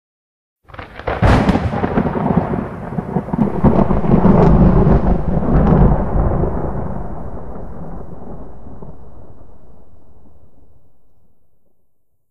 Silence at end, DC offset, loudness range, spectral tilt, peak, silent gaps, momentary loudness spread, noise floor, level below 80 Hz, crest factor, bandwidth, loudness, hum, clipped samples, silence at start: 0 s; 4%; 20 LU; -9.5 dB/octave; 0 dBFS; none; 23 LU; -61 dBFS; -24 dBFS; 16 dB; 7.2 kHz; -15 LUFS; none; under 0.1%; 0.55 s